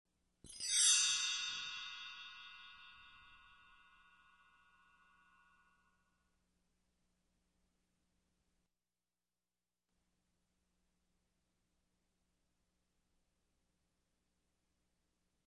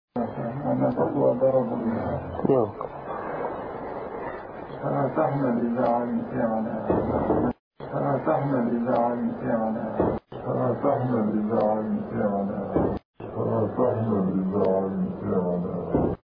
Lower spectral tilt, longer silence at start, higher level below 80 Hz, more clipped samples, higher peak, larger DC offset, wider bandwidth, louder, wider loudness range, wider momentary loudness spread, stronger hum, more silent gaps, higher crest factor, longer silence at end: second, 4 dB/octave vs -12.5 dB/octave; first, 0.45 s vs 0.15 s; second, -82 dBFS vs -50 dBFS; neither; second, -18 dBFS vs -10 dBFS; neither; first, 10.5 kHz vs 5.2 kHz; second, -34 LUFS vs -26 LUFS; first, 23 LU vs 3 LU; first, 27 LU vs 10 LU; neither; second, none vs 7.59-7.71 s, 13.05-13.14 s; first, 28 dB vs 16 dB; first, 12.35 s vs 0.1 s